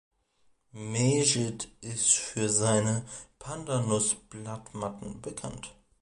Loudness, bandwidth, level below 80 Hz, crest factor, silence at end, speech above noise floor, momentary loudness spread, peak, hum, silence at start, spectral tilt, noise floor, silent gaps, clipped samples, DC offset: -28 LUFS; 11.5 kHz; -60 dBFS; 22 dB; 0.3 s; 39 dB; 17 LU; -10 dBFS; none; 0.75 s; -4 dB/octave; -69 dBFS; none; under 0.1%; under 0.1%